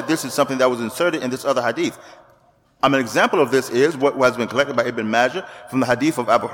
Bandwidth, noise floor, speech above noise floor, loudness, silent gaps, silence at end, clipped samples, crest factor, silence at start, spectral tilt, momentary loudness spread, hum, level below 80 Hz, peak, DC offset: 19 kHz; -56 dBFS; 37 dB; -19 LUFS; none; 0 s; under 0.1%; 16 dB; 0 s; -4.5 dB/octave; 5 LU; none; -60 dBFS; -2 dBFS; under 0.1%